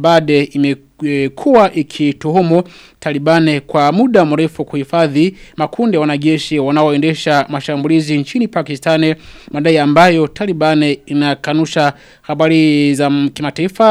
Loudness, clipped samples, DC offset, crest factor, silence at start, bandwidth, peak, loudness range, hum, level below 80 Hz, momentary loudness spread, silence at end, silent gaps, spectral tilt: -13 LUFS; under 0.1%; under 0.1%; 12 dB; 0 s; 12.5 kHz; 0 dBFS; 2 LU; none; -50 dBFS; 8 LU; 0 s; none; -6.5 dB/octave